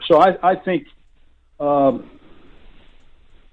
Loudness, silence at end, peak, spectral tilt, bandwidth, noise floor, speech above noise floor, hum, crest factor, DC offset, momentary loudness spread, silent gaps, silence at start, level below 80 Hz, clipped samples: -18 LUFS; 1.5 s; -2 dBFS; -7.5 dB/octave; 8.4 kHz; -52 dBFS; 36 dB; none; 18 dB; under 0.1%; 12 LU; none; 0 s; -50 dBFS; under 0.1%